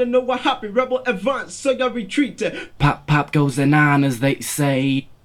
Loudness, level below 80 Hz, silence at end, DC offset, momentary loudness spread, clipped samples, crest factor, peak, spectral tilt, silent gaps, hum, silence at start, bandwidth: -19 LUFS; -44 dBFS; 0.1 s; under 0.1%; 7 LU; under 0.1%; 18 dB; -2 dBFS; -5.5 dB/octave; none; none; 0 s; 16.5 kHz